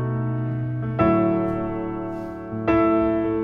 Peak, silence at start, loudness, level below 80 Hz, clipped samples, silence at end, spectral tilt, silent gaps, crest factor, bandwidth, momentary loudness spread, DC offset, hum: -6 dBFS; 0 s; -23 LUFS; -44 dBFS; under 0.1%; 0 s; -10.5 dB/octave; none; 16 dB; 4.9 kHz; 11 LU; under 0.1%; none